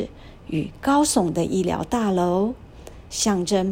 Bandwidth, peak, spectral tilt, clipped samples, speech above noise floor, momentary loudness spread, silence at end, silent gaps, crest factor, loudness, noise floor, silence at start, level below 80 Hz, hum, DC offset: 16.5 kHz; -6 dBFS; -5 dB/octave; under 0.1%; 20 dB; 12 LU; 0 s; none; 16 dB; -22 LUFS; -41 dBFS; 0 s; -46 dBFS; none; under 0.1%